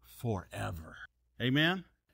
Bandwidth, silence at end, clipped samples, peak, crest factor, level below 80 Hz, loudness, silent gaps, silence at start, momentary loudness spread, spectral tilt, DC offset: 16 kHz; 0.3 s; under 0.1%; -18 dBFS; 18 dB; -58 dBFS; -33 LUFS; none; 0.1 s; 22 LU; -5.5 dB/octave; under 0.1%